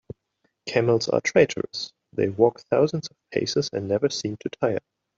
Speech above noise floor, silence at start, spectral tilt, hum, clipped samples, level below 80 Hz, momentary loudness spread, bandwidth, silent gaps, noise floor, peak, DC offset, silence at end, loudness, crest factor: 49 dB; 0.65 s; -5 dB/octave; none; under 0.1%; -64 dBFS; 11 LU; 7.8 kHz; none; -73 dBFS; -4 dBFS; under 0.1%; 0.4 s; -24 LUFS; 20 dB